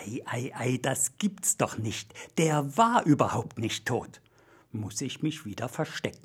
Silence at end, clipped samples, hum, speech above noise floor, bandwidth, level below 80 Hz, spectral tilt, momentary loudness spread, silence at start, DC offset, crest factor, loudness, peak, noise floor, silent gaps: 0.1 s; under 0.1%; none; 31 dB; 17 kHz; -66 dBFS; -4.5 dB/octave; 12 LU; 0 s; under 0.1%; 22 dB; -29 LUFS; -8 dBFS; -60 dBFS; none